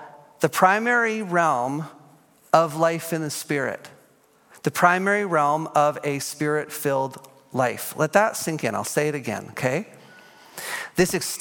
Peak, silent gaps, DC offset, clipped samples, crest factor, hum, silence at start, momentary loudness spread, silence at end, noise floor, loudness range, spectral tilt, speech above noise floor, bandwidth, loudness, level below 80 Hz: -2 dBFS; none; under 0.1%; under 0.1%; 22 dB; none; 0 s; 12 LU; 0 s; -58 dBFS; 3 LU; -4.5 dB/octave; 35 dB; 17.5 kHz; -23 LUFS; -64 dBFS